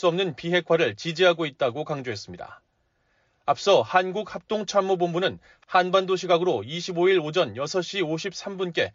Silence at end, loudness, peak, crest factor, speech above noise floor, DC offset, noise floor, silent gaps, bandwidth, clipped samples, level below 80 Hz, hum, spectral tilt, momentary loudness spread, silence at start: 0.05 s; -24 LUFS; -8 dBFS; 18 dB; 45 dB; under 0.1%; -70 dBFS; none; 7.6 kHz; under 0.1%; -68 dBFS; none; -3 dB/octave; 10 LU; 0 s